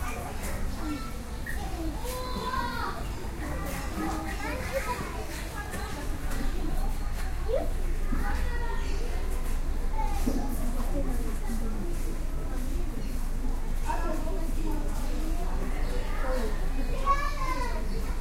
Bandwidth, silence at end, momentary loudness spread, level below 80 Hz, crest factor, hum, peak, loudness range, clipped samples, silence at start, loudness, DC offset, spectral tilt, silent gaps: 15.5 kHz; 0 s; 4 LU; -30 dBFS; 16 dB; none; -12 dBFS; 2 LU; under 0.1%; 0 s; -34 LUFS; under 0.1%; -5.5 dB/octave; none